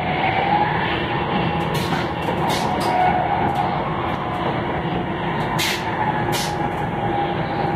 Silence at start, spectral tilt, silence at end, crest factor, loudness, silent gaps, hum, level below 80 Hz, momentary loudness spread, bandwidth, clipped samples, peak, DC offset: 0 s; -5 dB/octave; 0 s; 14 dB; -21 LUFS; none; none; -42 dBFS; 5 LU; 16 kHz; under 0.1%; -6 dBFS; under 0.1%